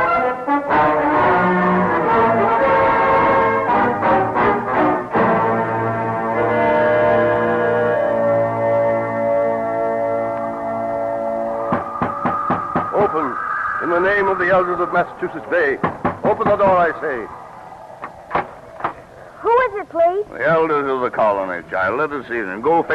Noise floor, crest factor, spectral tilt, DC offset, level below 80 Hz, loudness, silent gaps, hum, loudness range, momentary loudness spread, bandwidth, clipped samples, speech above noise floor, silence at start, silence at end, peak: -39 dBFS; 12 dB; -8 dB/octave; under 0.1%; -48 dBFS; -18 LUFS; none; none; 6 LU; 9 LU; 8.8 kHz; under 0.1%; 20 dB; 0 s; 0 s; -6 dBFS